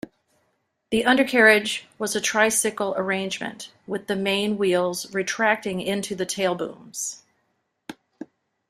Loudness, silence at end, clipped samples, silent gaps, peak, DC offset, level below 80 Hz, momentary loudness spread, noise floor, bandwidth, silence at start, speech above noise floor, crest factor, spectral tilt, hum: -22 LUFS; 0.45 s; under 0.1%; none; -2 dBFS; under 0.1%; -62 dBFS; 24 LU; -73 dBFS; 16 kHz; 0.9 s; 50 dB; 22 dB; -3 dB/octave; none